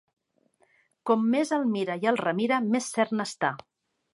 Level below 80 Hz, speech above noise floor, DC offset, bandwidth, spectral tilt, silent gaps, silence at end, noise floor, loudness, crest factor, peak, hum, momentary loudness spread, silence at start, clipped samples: -78 dBFS; 42 dB; under 0.1%; 11.5 kHz; -5 dB/octave; none; 0.55 s; -68 dBFS; -26 LUFS; 20 dB; -8 dBFS; none; 6 LU; 1.05 s; under 0.1%